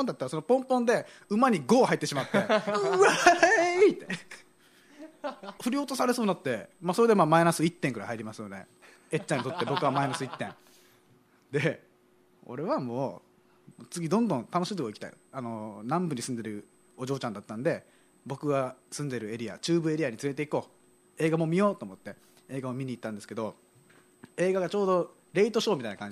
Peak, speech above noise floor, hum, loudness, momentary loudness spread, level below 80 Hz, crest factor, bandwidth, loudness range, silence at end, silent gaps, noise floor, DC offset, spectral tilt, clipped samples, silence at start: -6 dBFS; 35 dB; none; -28 LUFS; 17 LU; -74 dBFS; 22 dB; 15 kHz; 10 LU; 0 s; none; -64 dBFS; under 0.1%; -5 dB/octave; under 0.1%; 0 s